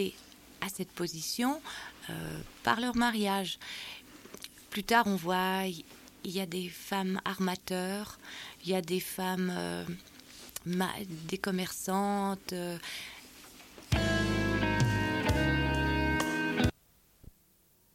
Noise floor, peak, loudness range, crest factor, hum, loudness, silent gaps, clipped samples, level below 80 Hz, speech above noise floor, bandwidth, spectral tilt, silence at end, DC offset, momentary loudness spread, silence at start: -66 dBFS; -12 dBFS; 5 LU; 22 dB; none; -32 LUFS; none; under 0.1%; -46 dBFS; 33 dB; 17 kHz; -4.5 dB/octave; 1.25 s; under 0.1%; 16 LU; 0 s